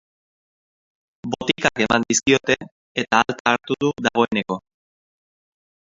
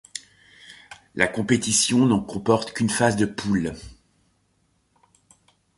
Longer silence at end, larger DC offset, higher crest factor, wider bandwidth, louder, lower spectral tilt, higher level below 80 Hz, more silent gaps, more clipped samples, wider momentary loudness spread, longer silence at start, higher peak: second, 1.35 s vs 1.85 s; neither; about the same, 22 dB vs 22 dB; second, 8 kHz vs 11.5 kHz; about the same, -20 LUFS vs -22 LUFS; about the same, -3 dB/octave vs -4 dB/octave; about the same, -54 dBFS vs -52 dBFS; first, 2.72-2.95 s, 3.40-3.45 s vs none; neither; second, 11 LU vs 19 LU; first, 1.25 s vs 0.15 s; about the same, 0 dBFS vs -2 dBFS